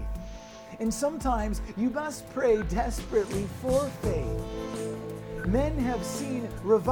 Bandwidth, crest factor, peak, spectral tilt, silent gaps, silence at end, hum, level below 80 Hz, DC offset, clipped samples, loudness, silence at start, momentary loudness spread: 19.5 kHz; 18 dB; -12 dBFS; -6 dB/octave; none; 0 s; none; -38 dBFS; under 0.1%; under 0.1%; -30 LUFS; 0 s; 11 LU